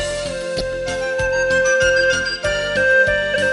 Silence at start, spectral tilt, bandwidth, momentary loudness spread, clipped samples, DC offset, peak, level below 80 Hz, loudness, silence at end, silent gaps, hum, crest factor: 0 s; -2.5 dB/octave; 11.5 kHz; 9 LU; under 0.1%; under 0.1%; -4 dBFS; -38 dBFS; -17 LUFS; 0 s; none; none; 14 dB